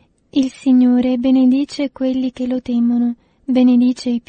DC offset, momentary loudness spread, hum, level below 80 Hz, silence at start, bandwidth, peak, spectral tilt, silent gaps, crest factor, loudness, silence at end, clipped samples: under 0.1%; 9 LU; none; -54 dBFS; 0.35 s; 8.8 kHz; -4 dBFS; -6 dB/octave; none; 12 dB; -16 LUFS; 0.1 s; under 0.1%